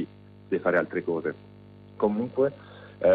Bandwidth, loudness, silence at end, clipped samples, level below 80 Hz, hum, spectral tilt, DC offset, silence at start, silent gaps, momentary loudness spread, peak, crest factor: 4.8 kHz; -28 LUFS; 0 s; under 0.1%; -66 dBFS; 50 Hz at -50 dBFS; -9.5 dB/octave; under 0.1%; 0 s; none; 18 LU; -12 dBFS; 16 dB